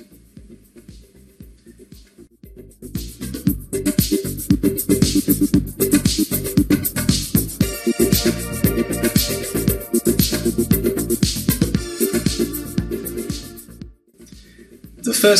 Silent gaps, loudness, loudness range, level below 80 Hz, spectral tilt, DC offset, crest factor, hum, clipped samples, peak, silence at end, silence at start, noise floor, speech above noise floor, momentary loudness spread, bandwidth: none; -19 LUFS; 8 LU; -34 dBFS; -4.5 dB/octave; under 0.1%; 20 dB; none; under 0.1%; 0 dBFS; 0 s; 0 s; -45 dBFS; 28 dB; 12 LU; 15 kHz